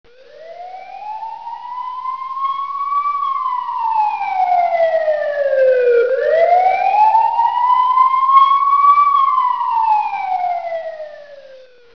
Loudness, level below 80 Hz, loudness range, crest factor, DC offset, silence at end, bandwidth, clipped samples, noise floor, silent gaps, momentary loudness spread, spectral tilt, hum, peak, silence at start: -15 LUFS; -64 dBFS; 9 LU; 16 dB; 0.4%; 0.4 s; 5.4 kHz; under 0.1%; -42 dBFS; none; 17 LU; -3 dB/octave; none; 0 dBFS; 0.4 s